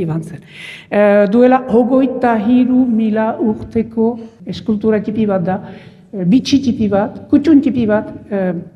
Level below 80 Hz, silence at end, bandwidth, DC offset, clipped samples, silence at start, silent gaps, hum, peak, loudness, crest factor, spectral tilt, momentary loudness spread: -48 dBFS; 0.05 s; 7.2 kHz; under 0.1%; under 0.1%; 0 s; none; none; 0 dBFS; -14 LUFS; 14 dB; -7.5 dB/octave; 13 LU